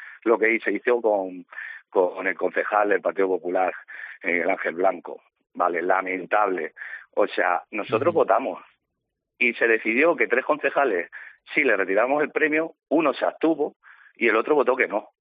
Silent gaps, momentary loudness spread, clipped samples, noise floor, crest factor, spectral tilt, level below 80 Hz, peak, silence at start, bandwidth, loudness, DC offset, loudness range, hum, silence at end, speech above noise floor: 13.76-13.80 s; 12 LU; under 0.1%; -81 dBFS; 18 dB; -2.5 dB/octave; -76 dBFS; -4 dBFS; 0 s; 4.9 kHz; -23 LUFS; under 0.1%; 3 LU; none; 0.15 s; 58 dB